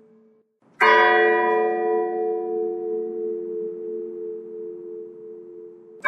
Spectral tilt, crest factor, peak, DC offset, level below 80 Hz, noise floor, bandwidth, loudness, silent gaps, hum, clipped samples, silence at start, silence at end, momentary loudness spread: -4.5 dB/octave; 22 dB; -2 dBFS; under 0.1%; under -90 dBFS; -59 dBFS; 6.2 kHz; -21 LUFS; none; none; under 0.1%; 0.8 s; 0 s; 23 LU